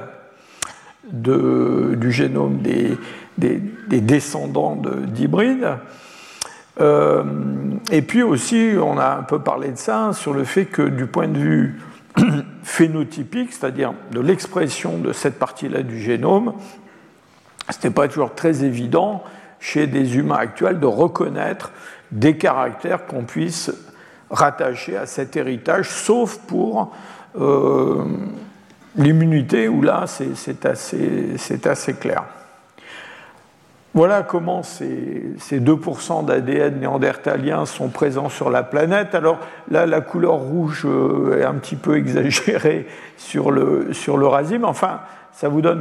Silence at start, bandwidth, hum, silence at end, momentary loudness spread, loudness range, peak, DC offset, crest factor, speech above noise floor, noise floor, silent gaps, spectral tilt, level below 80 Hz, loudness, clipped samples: 0 s; 13.5 kHz; none; 0 s; 12 LU; 4 LU; 0 dBFS; under 0.1%; 18 dB; 33 dB; -51 dBFS; none; -6 dB/octave; -64 dBFS; -19 LUFS; under 0.1%